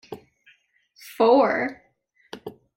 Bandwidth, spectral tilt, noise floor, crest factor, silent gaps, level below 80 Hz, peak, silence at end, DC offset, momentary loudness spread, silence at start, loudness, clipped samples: 16.5 kHz; -5.5 dB/octave; -65 dBFS; 20 dB; none; -68 dBFS; -6 dBFS; 0.25 s; under 0.1%; 26 LU; 0.1 s; -20 LUFS; under 0.1%